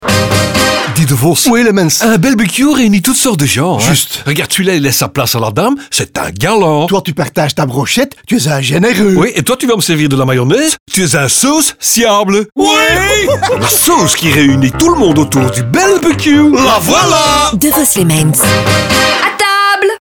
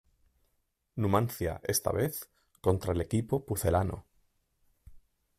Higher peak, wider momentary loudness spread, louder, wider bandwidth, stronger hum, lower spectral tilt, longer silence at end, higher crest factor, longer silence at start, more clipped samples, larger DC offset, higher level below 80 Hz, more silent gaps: first, 0 dBFS vs -12 dBFS; second, 5 LU vs 12 LU; first, -9 LUFS vs -31 LUFS; first, over 20 kHz vs 16 kHz; neither; second, -4 dB/octave vs -5.5 dB/octave; second, 0.1 s vs 0.4 s; second, 10 dB vs 22 dB; second, 0 s vs 0.95 s; neither; neither; first, -36 dBFS vs -54 dBFS; first, 10.80-10.86 s vs none